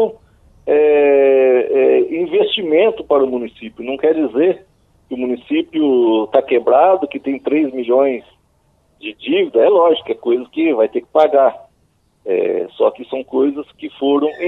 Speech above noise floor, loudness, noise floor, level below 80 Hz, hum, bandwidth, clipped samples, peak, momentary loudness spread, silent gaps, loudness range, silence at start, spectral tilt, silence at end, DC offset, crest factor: 44 dB; -15 LUFS; -59 dBFS; -58 dBFS; none; 4.1 kHz; under 0.1%; 0 dBFS; 14 LU; none; 4 LU; 0 s; -7 dB/octave; 0 s; under 0.1%; 16 dB